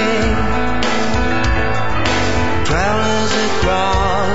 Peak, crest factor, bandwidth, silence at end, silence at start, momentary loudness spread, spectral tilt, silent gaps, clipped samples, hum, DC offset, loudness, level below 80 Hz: 0 dBFS; 14 dB; 8 kHz; 0 s; 0 s; 2 LU; -4.5 dB/octave; none; under 0.1%; none; 10%; -16 LUFS; -26 dBFS